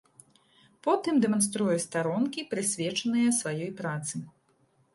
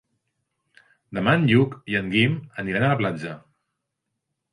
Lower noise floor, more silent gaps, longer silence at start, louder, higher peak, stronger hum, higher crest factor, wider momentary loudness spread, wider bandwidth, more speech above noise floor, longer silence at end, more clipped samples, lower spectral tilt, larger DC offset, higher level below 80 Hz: second, -68 dBFS vs -80 dBFS; neither; second, 0.85 s vs 1.1 s; second, -28 LUFS vs -22 LUFS; second, -12 dBFS vs -4 dBFS; neither; about the same, 18 dB vs 20 dB; second, 9 LU vs 15 LU; about the same, 12 kHz vs 11.5 kHz; second, 40 dB vs 59 dB; second, 0.65 s vs 1.15 s; neither; second, -4 dB/octave vs -7.5 dB/octave; neither; second, -74 dBFS vs -58 dBFS